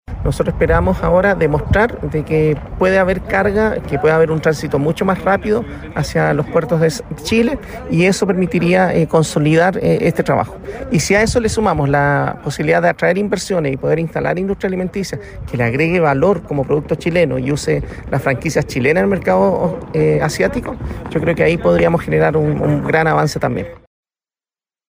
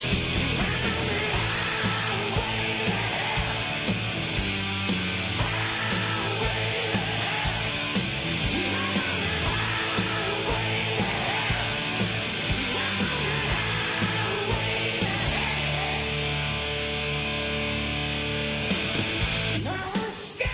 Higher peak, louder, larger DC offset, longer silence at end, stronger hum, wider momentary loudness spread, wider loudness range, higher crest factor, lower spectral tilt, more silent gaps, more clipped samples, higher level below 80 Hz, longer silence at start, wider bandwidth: first, -2 dBFS vs -12 dBFS; first, -16 LUFS vs -26 LUFS; neither; first, 1.1 s vs 0 s; neither; first, 7 LU vs 2 LU; about the same, 2 LU vs 1 LU; about the same, 14 dB vs 16 dB; first, -6 dB/octave vs -3 dB/octave; neither; neither; first, -32 dBFS vs -40 dBFS; about the same, 0.1 s vs 0 s; first, 16 kHz vs 4 kHz